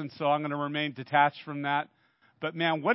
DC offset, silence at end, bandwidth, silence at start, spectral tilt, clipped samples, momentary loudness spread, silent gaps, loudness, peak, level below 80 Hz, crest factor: under 0.1%; 0 s; 5.8 kHz; 0 s; -9.5 dB/octave; under 0.1%; 11 LU; none; -29 LUFS; -10 dBFS; -80 dBFS; 20 dB